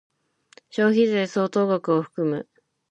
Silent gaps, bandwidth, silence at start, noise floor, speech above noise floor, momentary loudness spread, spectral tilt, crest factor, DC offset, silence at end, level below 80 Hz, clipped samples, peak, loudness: none; 9 kHz; 0.75 s; -56 dBFS; 35 dB; 8 LU; -6.5 dB/octave; 16 dB; under 0.1%; 0.5 s; -74 dBFS; under 0.1%; -8 dBFS; -23 LUFS